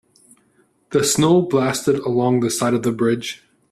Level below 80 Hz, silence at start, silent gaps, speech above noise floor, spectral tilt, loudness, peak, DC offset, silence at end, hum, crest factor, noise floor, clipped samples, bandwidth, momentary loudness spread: -56 dBFS; 0.9 s; none; 42 dB; -5 dB/octave; -18 LUFS; -4 dBFS; under 0.1%; 0.35 s; none; 14 dB; -60 dBFS; under 0.1%; 14 kHz; 8 LU